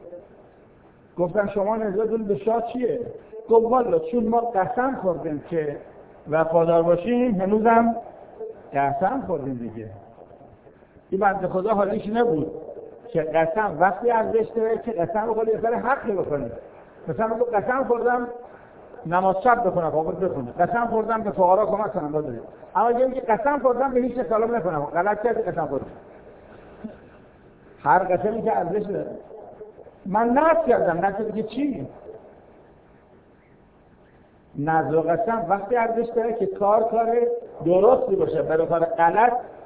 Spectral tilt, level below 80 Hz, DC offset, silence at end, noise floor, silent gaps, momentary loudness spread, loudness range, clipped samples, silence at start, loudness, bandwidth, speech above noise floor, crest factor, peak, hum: -11 dB/octave; -54 dBFS; under 0.1%; 0 s; -54 dBFS; none; 17 LU; 5 LU; under 0.1%; 0 s; -22 LUFS; 4 kHz; 32 dB; 18 dB; -4 dBFS; none